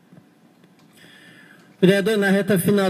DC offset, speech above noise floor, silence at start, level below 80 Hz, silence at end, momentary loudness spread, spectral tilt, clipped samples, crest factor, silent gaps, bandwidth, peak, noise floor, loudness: under 0.1%; 36 dB; 1.8 s; -70 dBFS; 0 s; 2 LU; -6 dB/octave; under 0.1%; 20 dB; none; 15.5 kHz; -2 dBFS; -54 dBFS; -18 LUFS